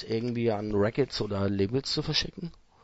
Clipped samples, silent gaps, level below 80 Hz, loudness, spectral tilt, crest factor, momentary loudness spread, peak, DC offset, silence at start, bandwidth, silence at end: under 0.1%; none; -50 dBFS; -29 LUFS; -5.5 dB/octave; 16 dB; 7 LU; -12 dBFS; under 0.1%; 0 s; 8 kHz; 0.3 s